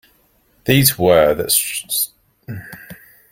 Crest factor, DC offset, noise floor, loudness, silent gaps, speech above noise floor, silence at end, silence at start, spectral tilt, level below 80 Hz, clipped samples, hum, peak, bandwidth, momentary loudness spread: 18 dB; under 0.1%; -58 dBFS; -15 LUFS; none; 42 dB; 0.35 s; 0.65 s; -3.5 dB/octave; -46 dBFS; under 0.1%; none; 0 dBFS; 17 kHz; 21 LU